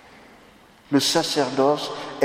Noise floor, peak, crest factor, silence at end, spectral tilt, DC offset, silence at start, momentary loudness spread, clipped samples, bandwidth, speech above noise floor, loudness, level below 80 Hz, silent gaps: -51 dBFS; -4 dBFS; 18 dB; 0 s; -3.5 dB/octave; under 0.1%; 0.9 s; 6 LU; under 0.1%; 16 kHz; 30 dB; -21 LUFS; -64 dBFS; none